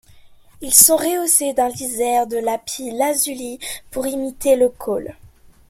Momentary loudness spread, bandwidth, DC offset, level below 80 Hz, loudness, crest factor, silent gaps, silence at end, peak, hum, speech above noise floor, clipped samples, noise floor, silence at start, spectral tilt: 17 LU; 16.5 kHz; under 0.1%; -50 dBFS; -17 LUFS; 20 dB; none; 0.4 s; 0 dBFS; none; 27 dB; under 0.1%; -45 dBFS; 0.15 s; -1.5 dB/octave